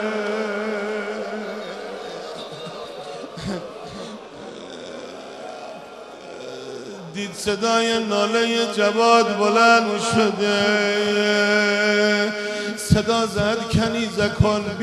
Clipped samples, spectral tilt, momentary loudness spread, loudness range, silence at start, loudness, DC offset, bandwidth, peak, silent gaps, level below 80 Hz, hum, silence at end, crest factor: under 0.1%; -4.5 dB/octave; 19 LU; 17 LU; 0 s; -20 LUFS; under 0.1%; 13.5 kHz; 0 dBFS; none; -46 dBFS; none; 0 s; 22 dB